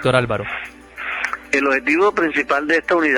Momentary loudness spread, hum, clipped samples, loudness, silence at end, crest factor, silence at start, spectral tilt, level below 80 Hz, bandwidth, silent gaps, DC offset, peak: 12 LU; none; under 0.1%; -18 LUFS; 0 s; 16 dB; 0 s; -5.5 dB/octave; -50 dBFS; 18 kHz; none; under 0.1%; -2 dBFS